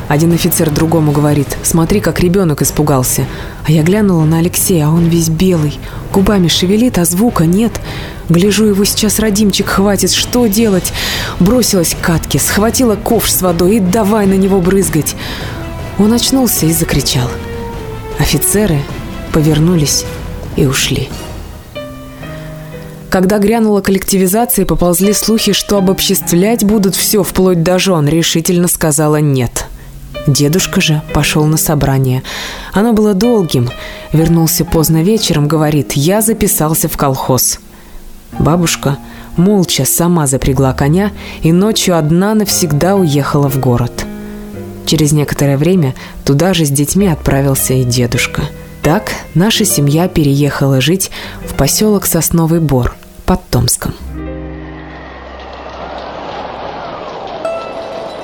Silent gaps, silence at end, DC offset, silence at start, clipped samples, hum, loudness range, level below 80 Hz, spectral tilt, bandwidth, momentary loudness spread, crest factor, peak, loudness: none; 0 s; under 0.1%; 0 s; under 0.1%; none; 4 LU; -28 dBFS; -5 dB/octave; 19.5 kHz; 14 LU; 12 dB; 0 dBFS; -11 LUFS